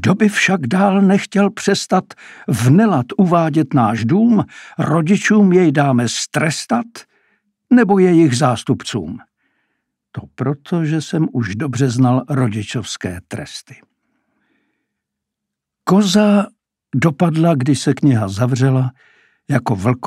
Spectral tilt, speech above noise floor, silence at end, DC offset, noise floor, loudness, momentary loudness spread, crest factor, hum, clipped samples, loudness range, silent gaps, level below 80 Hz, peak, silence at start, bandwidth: -6 dB/octave; 66 dB; 0 s; under 0.1%; -81 dBFS; -15 LUFS; 13 LU; 16 dB; none; under 0.1%; 7 LU; none; -56 dBFS; 0 dBFS; 0 s; 13.5 kHz